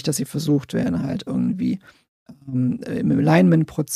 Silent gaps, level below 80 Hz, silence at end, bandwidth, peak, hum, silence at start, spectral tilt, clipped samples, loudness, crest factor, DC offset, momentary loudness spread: 2.08-2.26 s; -52 dBFS; 0 s; 15 kHz; -4 dBFS; none; 0.05 s; -6.5 dB/octave; under 0.1%; -21 LUFS; 18 dB; under 0.1%; 10 LU